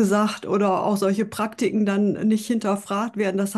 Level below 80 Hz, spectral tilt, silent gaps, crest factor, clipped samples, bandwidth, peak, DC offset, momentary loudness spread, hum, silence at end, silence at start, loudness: -66 dBFS; -6 dB/octave; none; 12 dB; under 0.1%; 12.5 kHz; -10 dBFS; under 0.1%; 4 LU; none; 0 s; 0 s; -22 LUFS